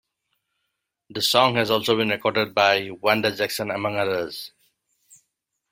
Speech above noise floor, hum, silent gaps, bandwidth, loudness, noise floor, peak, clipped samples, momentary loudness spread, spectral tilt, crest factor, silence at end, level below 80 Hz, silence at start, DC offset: 57 dB; none; none; 16.5 kHz; -21 LUFS; -79 dBFS; -2 dBFS; under 0.1%; 11 LU; -3.5 dB/octave; 22 dB; 1.25 s; -64 dBFS; 1.1 s; under 0.1%